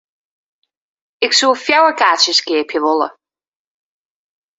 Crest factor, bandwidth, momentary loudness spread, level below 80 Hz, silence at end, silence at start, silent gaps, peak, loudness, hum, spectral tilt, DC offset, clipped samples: 18 dB; 8 kHz; 8 LU; -68 dBFS; 1.45 s; 1.2 s; none; 0 dBFS; -13 LUFS; none; 0.5 dB/octave; under 0.1%; under 0.1%